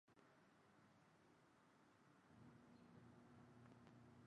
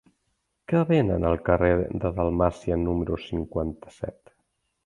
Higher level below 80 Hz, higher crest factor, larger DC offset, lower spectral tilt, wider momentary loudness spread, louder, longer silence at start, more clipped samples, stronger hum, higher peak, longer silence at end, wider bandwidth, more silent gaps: second, -88 dBFS vs -40 dBFS; about the same, 16 dB vs 20 dB; neither; second, -6.5 dB/octave vs -9 dB/octave; second, 1 LU vs 13 LU; second, -68 LUFS vs -25 LUFS; second, 0.05 s vs 0.7 s; neither; neither; second, -52 dBFS vs -6 dBFS; second, 0 s vs 0.75 s; second, 9.4 kHz vs 10.5 kHz; neither